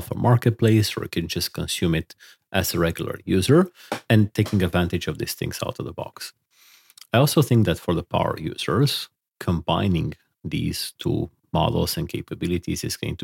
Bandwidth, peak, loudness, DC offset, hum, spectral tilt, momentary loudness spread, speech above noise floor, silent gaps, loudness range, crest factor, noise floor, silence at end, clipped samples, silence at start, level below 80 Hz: 17 kHz; -4 dBFS; -23 LUFS; under 0.1%; none; -5.5 dB/octave; 12 LU; 33 dB; none; 3 LU; 18 dB; -55 dBFS; 0 s; under 0.1%; 0 s; -44 dBFS